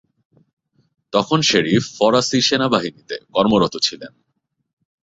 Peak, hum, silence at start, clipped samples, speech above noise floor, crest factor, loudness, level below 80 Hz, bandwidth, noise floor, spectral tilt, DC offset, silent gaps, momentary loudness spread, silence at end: -2 dBFS; none; 1.15 s; under 0.1%; 55 dB; 18 dB; -17 LUFS; -54 dBFS; 8 kHz; -73 dBFS; -4 dB/octave; under 0.1%; none; 8 LU; 0.95 s